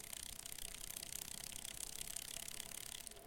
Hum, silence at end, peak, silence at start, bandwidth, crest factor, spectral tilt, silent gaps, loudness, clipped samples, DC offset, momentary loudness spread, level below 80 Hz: none; 0 s; -26 dBFS; 0 s; 17 kHz; 24 dB; 0 dB/octave; none; -47 LUFS; under 0.1%; under 0.1%; 3 LU; -62 dBFS